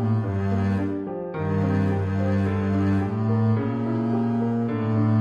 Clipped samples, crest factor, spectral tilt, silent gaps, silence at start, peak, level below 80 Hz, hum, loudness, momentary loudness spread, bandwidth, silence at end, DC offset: under 0.1%; 10 dB; -10 dB/octave; none; 0 s; -12 dBFS; -40 dBFS; none; -24 LUFS; 4 LU; 7 kHz; 0 s; under 0.1%